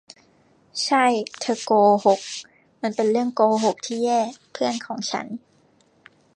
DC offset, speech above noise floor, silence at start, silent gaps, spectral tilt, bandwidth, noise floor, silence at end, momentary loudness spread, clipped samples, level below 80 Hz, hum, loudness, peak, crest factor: under 0.1%; 38 dB; 0.75 s; none; -4 dB/octave; 10.5 kHz; -59 dBFS; 1 s; 13 LU; under 0.1%; -76 dBFS; none; -22 LUFS; -4 dBFS; 18 dB